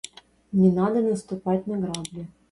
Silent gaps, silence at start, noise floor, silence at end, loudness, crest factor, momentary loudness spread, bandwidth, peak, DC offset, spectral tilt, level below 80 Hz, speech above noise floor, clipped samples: none; 0.5 s; -46 dBFS; 0.25 s; -24 LUFS; 18 dB; 17 LU; 11.5 kHz; -8 dBFS; under 0.1%; -7 dB/octave; -58 dBFS; 22 dB; under 0.1%